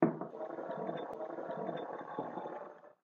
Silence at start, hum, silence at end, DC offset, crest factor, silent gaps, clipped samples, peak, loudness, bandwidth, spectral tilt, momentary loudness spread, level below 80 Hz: 0 s; none; 0.1 s; under 0.1%; 26 dB; none; under 0.1%; -14 dBFS; -42 LUFS; 6.8 kHz; -6.5 dB/octave; 4 LU; -86 dBFS